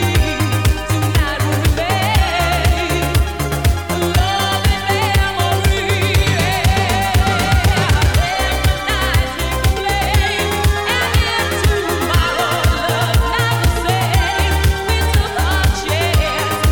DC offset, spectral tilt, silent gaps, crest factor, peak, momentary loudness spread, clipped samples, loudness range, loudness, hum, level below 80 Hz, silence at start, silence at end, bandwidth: 0.7%; -4.5 dB/octave; none; 14 dB; -2 dBFS; 3 LU; under 0.1%; 1 LU; -16 LUFS; none; -20 dBFS; 0 s; 0 s; over 20 kHz